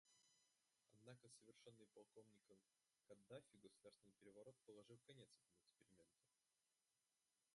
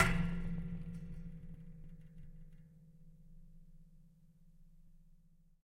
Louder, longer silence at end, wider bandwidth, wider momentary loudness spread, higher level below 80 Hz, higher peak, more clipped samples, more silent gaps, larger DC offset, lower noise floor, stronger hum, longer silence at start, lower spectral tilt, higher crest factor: second, -68 LUFS vs -42 LUFS; second, 0 s vs 0.45 s; second, 11.5 kHz vs 15 kHz; second, 5 LU vs 24 LU; second, under -90 dBFS vs -48 dBFS; second, -48 dBFS vs -14 dBFS; neither; neither; neither; first, under -90 dBFS vs -65 dBFS; neither; about the same, 0.05 s vs 0 s; about the same, -4.5 dB/octave vs -5.5 dB/octave; second, 22 dB vs 28 dB